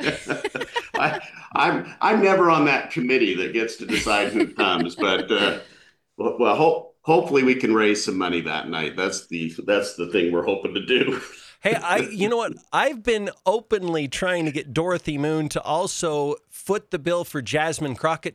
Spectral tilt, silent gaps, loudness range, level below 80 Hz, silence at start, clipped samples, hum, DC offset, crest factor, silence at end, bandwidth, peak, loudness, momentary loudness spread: -4.5 dB/octave; none; 4 LU; -56 dBFS; 0 s; under 0.1%; none; under 0.1%; 16 dB; 0.05 s; 14.5 kHz; -6 dBFS; -22 LUFS; 9 LU